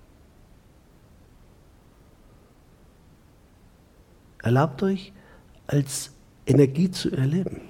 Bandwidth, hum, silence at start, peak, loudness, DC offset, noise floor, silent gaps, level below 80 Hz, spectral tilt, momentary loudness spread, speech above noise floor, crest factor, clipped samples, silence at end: 16.5 kHz; none; 4.45 s; -6 dBFS; -24 LUFS; under 0.1%; -55 dBFS; none; -54 dBFS; -6.5 dB/octave; 17 LU; 32 dB; 22 dB; under 0.1%; 0 s